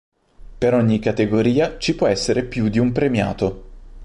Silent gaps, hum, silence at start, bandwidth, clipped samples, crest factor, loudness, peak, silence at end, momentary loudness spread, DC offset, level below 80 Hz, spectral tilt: none; none; 0.45 s; 11.5 kHz; under 0.1%; 14 dB; -19 LUFS; -6 dBFS; 0 s; 5 LU; under 0.1%; -40 dBFS; -6 dB/octave